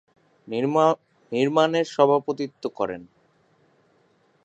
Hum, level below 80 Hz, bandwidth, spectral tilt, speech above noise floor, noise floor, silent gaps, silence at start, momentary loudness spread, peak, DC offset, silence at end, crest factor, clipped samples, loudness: none; -70 dBFS; 8.4 kHz; -6 dB/octave; 41 dB; -63 dBFS; none; 0.5 s; 11 LU; -4 dBFS; under 0.1%; 1.4 s; 22 dB; under 0.1%; -23 LUFS